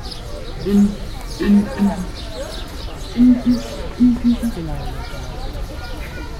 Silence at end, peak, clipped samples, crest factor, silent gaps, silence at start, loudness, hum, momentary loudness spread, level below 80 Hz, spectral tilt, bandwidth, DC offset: 0 s; -4 dBFS; under 0.1%; 16 dB; none; 0 s; -19 LUFS; none; 15 LU; -30 dBFS; -6.5 dB/octave; 15 kHz; under 0.1%